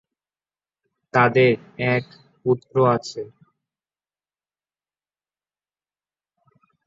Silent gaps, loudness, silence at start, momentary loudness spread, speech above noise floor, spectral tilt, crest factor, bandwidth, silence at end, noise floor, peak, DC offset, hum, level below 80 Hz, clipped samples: none; -20 LUFS; 1.15 s; 16 LU; over 70 dB; -7 dB/octave; 22 dB; 7.8 kHz; 3.6 s; under -90 dBFS; -2 dBFS; under 0.1%; 50 Hz at -60 dBFS; -64 dBFS; under 0.1%